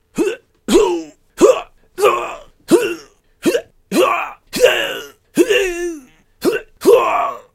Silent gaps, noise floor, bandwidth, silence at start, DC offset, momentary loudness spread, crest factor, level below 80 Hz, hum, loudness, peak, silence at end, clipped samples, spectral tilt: none; -40 dBFS; 16.5 kHz; 0.15 s; under 0.1%; 15 LU; 16 dB; -44 dBFS; none; -16 LUFS; 0 dBFS; 0.15 s; under 0.1%; -3.5 dB/octave